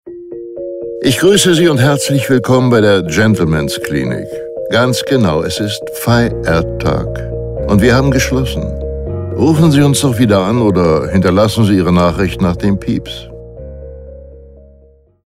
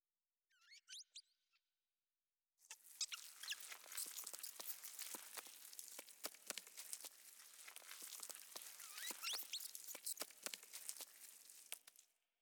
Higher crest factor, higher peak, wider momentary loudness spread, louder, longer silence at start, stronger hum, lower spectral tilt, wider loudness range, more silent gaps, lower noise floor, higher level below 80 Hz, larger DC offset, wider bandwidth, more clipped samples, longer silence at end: second, 12 dB vs 30 dB; first, 0 dBFS vs -24 dBFS; first, 15 LU vs 12 LU; first, -12 LUFS vs -51 LUFS; second, 0.05 s vs 0.55 s; neither; first, -5.5 dB/octave vs 2.5 dB/octave; about the same, 4 LU vs 4 LU; neither; second, -46 dBFS vs under -90 dBFS; first, -30 dBFS vs under -90 dBFS; neither; second, 16 kHz vs over 20 kHz; neither; first, 0.8 s vs 0.35 s